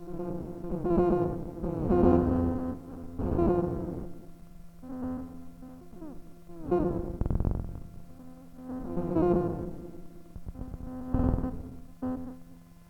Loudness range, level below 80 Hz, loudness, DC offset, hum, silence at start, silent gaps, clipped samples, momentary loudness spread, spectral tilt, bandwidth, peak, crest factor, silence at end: 8 LU; -40 dBFS; -30 LUFS; under 0.1%; none; 0 s; none; under 0.1%; 23 LU; -10.5 dB/octave; 6 kHz; -10 dBFS; 20 dB; 0.05 s